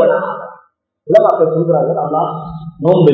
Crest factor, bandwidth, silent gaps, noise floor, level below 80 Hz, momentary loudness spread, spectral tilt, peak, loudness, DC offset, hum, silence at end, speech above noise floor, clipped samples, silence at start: 14 dB; 6.2 kHz; none; -49 dBFS; -50 dBFS; 16 LU; -9.5 dB/octave; 0 dBFS; -14 LUFS; under 0.1%; none; 0 s; 38 dB; 0.4%; 0 s